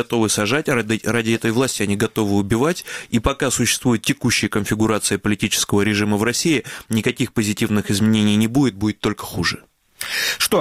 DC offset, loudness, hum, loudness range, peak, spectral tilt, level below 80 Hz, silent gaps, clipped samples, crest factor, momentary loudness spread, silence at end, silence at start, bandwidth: 0.1%; -19 LUFS; none; 1 LU; -2 dBFS; -4 dB/octave; -42 dBFS; none; under 0.1%; 18 dB; 5 LU; 0 s; 0 s; 16.5 kHz